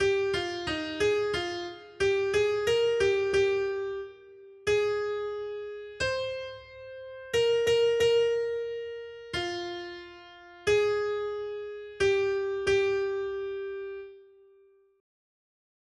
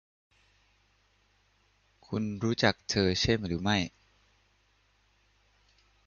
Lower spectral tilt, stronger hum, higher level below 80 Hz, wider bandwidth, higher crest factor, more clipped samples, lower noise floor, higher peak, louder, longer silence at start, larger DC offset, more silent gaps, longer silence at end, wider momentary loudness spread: about the same, -4 dB/octave vs -4.5 dB/octave; second, none vs 50 Hz at -55 dBFS; second, -58 dBFS vs -52 dBFS; first, 12.5 kHz vs 7.4 kHz; second, 14 dB vs 24 dB; neither; second, -61 dBFS vs -69 dBFS; second, -14 dBFS vs -10 dBFS; about the same, -29 LUFS vs -29 LUFS; second, 0 s vs 2.1 s; neither; neither; second, 1.75 s vs 2.2 s; first, 17 LU vs 9 LU